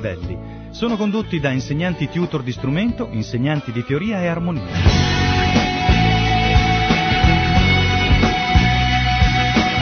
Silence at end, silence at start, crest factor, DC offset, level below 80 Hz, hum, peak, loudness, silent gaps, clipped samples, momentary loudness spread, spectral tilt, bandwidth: 0 s; 0 s; 16 dB; under 0.1%; -24 dBFS; none; 0 dBFS; -17 LUFS; none; under 0.1%; 8 LU; -5.5 dB/octave; 6.8 kHz